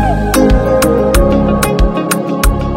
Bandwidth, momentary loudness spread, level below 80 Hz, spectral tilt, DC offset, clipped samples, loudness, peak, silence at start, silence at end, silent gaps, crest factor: 17 kHz; 4 LU; -16 dBFS; -5.5 dB/octave; under 0.1%; under 0.1%; -12 LUFS; 0 dBFS; 0 s; 0 s; none; 10 dB